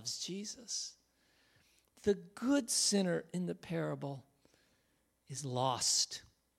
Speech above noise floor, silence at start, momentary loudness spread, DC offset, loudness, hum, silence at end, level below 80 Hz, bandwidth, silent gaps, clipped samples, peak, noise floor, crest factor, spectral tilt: 41 dB; 0 s; 15 LU; under 0.1%; -35 LUFS; none; 0.4 s; -74 dBFS; 16 kHz; none; under 0.1%; -18 dBFS; -77 dBFS; 20 dB; -3 dB/octave